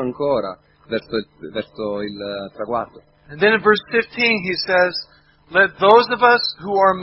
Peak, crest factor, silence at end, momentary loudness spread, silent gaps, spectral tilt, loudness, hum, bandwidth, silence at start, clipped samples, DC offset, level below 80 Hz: 0 dBFS; 18 dB; 0 s; 16 LU; none; -7 dB/octave; -18 LUFS; none; 6 kHz; 0 s; under 0.1%; under 0.1%; -56 dBFS